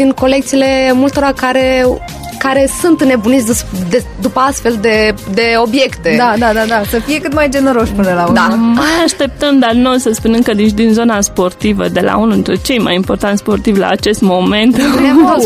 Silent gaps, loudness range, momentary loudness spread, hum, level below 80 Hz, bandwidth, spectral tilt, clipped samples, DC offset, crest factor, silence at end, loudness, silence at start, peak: none; 2 LU; 4 LU; none; -30 dBFS; 15.5 kHz; -4.5 dB/octave; under 0.1%; under 0.1%; 10 dB; 0 s; -11 LUFS; 0 s; 0 dBFS